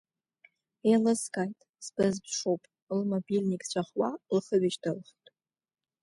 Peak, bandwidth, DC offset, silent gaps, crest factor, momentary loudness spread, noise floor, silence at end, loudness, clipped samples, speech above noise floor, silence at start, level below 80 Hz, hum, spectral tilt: -14 dBFS; 11.5 kHz; under 0.1%; 1.69-1.73 s, 2.82-2.87 s; 18 dB; 10 LU; under -90 dBFS; 1 s; -30 LUFS; under 0.1%; over 61 dB; 0.85 s; -74 dBFS; none; -5.5 dB/octave